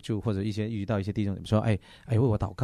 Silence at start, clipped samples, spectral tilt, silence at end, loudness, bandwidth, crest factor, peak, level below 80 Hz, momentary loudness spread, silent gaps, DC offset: 0.05 s; under 0.1%; -8 dB/octave; 0 s; -29 LUFS; 10.5 kHz; 18 dB; -10 dBFS; -50 dBFS; 5 LU; none; under 0.1%